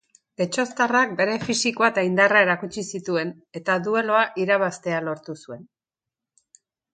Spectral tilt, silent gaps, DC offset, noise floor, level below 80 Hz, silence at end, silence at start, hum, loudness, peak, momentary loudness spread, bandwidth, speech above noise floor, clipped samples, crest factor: -4 dB/octave; none; under 0.1%; -89 dBFS; -66 dBFS; 1.3 s; 0.4 s; none; -22 LUFS; -2 dBFS; 14 LU; 9.6 kHz; 66 dB; under 0.1%; 22 dB